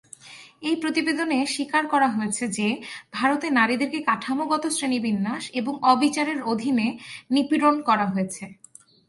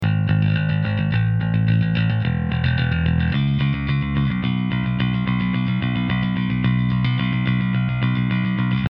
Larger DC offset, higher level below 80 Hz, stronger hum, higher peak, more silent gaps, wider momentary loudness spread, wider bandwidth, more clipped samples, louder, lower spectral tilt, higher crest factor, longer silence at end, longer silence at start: neither; second, -70 dBFS vs -36 dBFS; neither; about the same, -4 dBFS vs -6 dBFS; neither; first, 11 LU vs 3 LU; first, 11.5 kHz vs 5.4 kHz; neither; second, -23 LUFS vs -20 LUFS; second, -4 dB/octave vs -10 dB/octave; first, 20 dB vs 12 dB; first, 0.55 s vs 0.05 s; first, 0.25 s vs 0 s